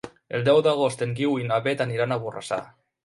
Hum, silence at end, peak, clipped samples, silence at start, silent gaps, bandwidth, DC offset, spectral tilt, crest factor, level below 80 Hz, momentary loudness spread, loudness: none; 0.35 s; -8 dBFS; under 0.1%; 0.05 s; none; 11.5 kHz; under 0.1%; -6 dB/octave; 16 dB; -64 dBFS; 11 LU; -24 LUFS